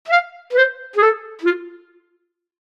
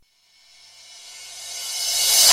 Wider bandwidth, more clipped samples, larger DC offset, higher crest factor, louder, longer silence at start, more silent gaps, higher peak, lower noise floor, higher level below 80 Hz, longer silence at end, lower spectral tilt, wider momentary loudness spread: second, 7.6 kHz vs 16.5 kHz; neither; neither; about the same, 18 dB vs 20 dB; about the same, -18 LUFS vs -19 LUFS; second, 0.05 s vs 0.95 s; neither; about the same, -2 dBFS vs -2 dBFS; first, -69 dBFS vs -57 dBFS; second, -74 dBFS vs -66 dBFS; first, 0.85 s vs 0 s; first, -2 dB/octave vs 3.5 dB/octave; second, 5 LU vs 26 LU